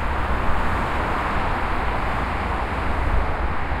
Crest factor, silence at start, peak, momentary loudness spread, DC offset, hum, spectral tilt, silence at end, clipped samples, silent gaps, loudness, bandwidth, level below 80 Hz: 14 dB; 0 s; -8 dBFS; 2 LU; under 0.1%; none; -6.5 dB/octave; 0 s; under 0.1%; none; -24 LUFS; 11.5 kHz; -26 dBFS